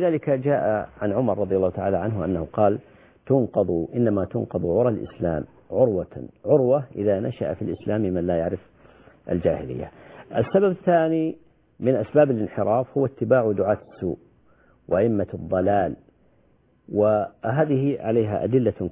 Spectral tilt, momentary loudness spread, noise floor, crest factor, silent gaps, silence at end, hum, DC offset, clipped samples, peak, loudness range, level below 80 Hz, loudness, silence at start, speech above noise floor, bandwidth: -12.5 dB/octave; 9 LU; -61 dBFS; 18 dB; none; 0 s; none; under 0.1%; under 0.1%; -6 dBFS; 3 LU; -48 dBFS; -23 LUFS; 0 s; 38 dB; 3.8 kHz